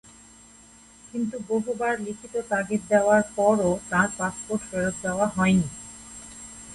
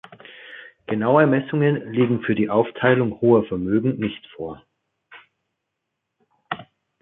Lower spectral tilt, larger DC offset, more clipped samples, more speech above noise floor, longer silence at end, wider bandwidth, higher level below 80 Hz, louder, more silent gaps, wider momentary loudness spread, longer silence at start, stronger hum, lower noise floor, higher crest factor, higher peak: second, -5.5 dB/octave vs -11 dB/octave; neither; neither; second, 27 dB vs 60 dB; second, 0 s vs 0.4 s; first, 11.5 kHz vs 4 kHz; about the same, -54 dBFS vs -56 dBFS; second, -25 LUFS vs -20 LUFS; neither; about the same, 19 LU vs 18 LU; first, 1.05 s vs 0.3 s; neither; second, -51 dBFS vs -80 dBFS; about the same, 20 dB vs 20 dB; second, -6 dBFS vs -2 dBFS